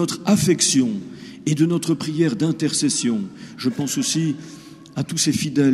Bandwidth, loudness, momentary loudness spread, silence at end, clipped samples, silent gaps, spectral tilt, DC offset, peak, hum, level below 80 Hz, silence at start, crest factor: 15 kHz; -20 LUFS; 15 LU; 0 s; under 0.1%; none; -4.5 dB/octave; under 0.1%; -4 dBFS; none; -58 dBFS; 0 s; 16 dB